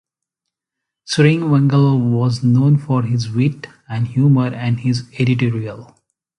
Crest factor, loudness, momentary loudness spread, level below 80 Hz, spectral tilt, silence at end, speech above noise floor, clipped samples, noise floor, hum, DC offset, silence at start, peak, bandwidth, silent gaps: 16 dB; -16 LUFS; 9 LU; -54 dBFS; -7.5 dB/octave; 0.55 s; 66 dB; under 0.1%; -82 dBFS; none; under 0.1%; 1.1 s; 0 dBFS; 10.5 kHz; none